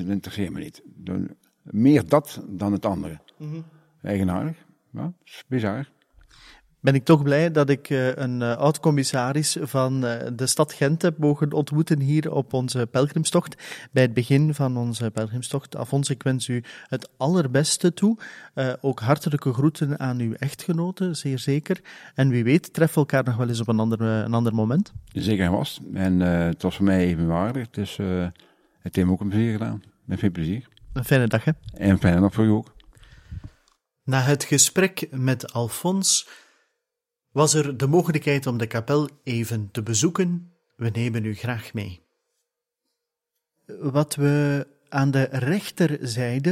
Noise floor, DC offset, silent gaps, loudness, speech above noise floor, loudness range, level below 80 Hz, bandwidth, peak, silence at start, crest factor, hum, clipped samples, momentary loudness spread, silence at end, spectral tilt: -84 dBFS; under 0.1%; none; -23 LUFS; 61 dB; 5 LU; -52 dBFS; 16.5 kHz; -4 dBFS; 0 s; 20 dB; none; under 0.1%; 13 LU; 0 s; -5.5 dB/octave